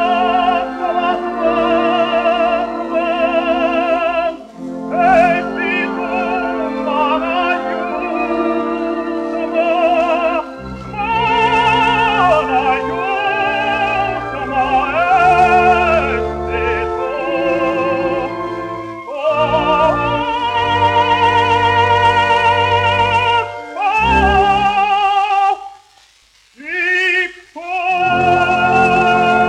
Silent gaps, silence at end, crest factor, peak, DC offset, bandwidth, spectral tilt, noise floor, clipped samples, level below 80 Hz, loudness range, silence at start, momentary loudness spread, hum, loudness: none; 0 s; 14 dB; 0 dBFS; under 0.1%; 10.5 kHz; -5.5 dB/octave; -51 dBFS; under 0.1%; -36 dBFS; 5 LU; 0 s; 9 LU; none; -15 LUFS